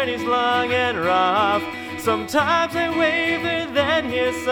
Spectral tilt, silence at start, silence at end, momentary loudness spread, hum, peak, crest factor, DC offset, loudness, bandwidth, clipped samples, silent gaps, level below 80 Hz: -4 dB/octave; 0 s; 0 s; 5 LU; none; -6 dBFS; 16 dB; under 0.1%; -20 LUFS; 19.5 kHz; under 0.1%; none; -52 dBFS